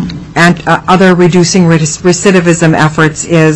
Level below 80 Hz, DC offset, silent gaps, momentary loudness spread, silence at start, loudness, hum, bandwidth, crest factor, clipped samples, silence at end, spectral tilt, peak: -36 dBFS; under 0.1%; none; 4 LU; 0 s; -7 LUFS; none; 11 kHz; 8 dB; 0.6%; 0 s; -5 dB/octave; 0 dBFS